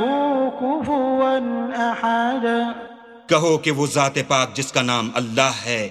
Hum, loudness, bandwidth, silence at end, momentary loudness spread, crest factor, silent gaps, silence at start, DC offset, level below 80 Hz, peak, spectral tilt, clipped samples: none; -20 LUFS; 13.5 kHz; 0 s; 5 LU; 20 dB; none; 0 s; under 0.1%; -60 dBFS; 0 dBFS; -4 dB/octave; under 0.1%